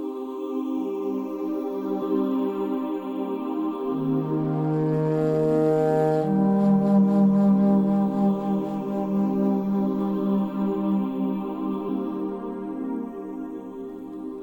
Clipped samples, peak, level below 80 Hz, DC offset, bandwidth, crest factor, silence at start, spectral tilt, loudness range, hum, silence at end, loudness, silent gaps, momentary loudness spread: under 0.1%; -10 dBFS; -60 dBFS; under 0.1%; 17 kHz; 14 dB; 0 s; -10 dB/octave; 7 LU; none; 0 s; -24 LUFS; none; 12 LU